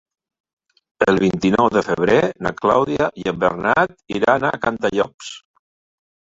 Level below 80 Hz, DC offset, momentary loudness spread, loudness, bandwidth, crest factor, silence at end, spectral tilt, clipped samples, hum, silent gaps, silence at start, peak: -50 dBFS; under 0.1%; 6 LU; -18 LUFS; 7.8 kHz; 18 dB; 1 s; -6 dB/octave; under 0.1%; none; 5.14-5.18 s; 1 s; -2 dBFS